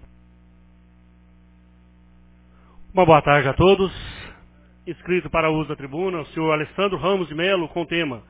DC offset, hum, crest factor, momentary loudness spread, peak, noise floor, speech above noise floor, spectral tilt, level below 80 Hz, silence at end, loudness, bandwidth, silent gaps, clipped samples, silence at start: under 0.1%; 60 Hz at -50 dBFS; 22 dB; 20 LU; 0 dBFS; -52 dBFS; 32 dB; -10 dB/octave; -44 dBFS; 0.1 s; -20 LUFS; 4 kHz; none; under 0.1%; 2.8 s